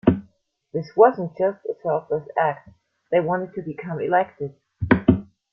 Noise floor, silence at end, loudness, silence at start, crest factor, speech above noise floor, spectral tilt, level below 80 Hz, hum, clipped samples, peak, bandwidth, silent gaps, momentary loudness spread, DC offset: -59 dBFS; 0.3 s; -22 LUFS; 0.05 s; 20 dB; 37 dB; -10 dB/octave; -50 dBFS; none; under 0.1%; -2 dBFS; 6 kHz; none; 15 LU; under 0.1%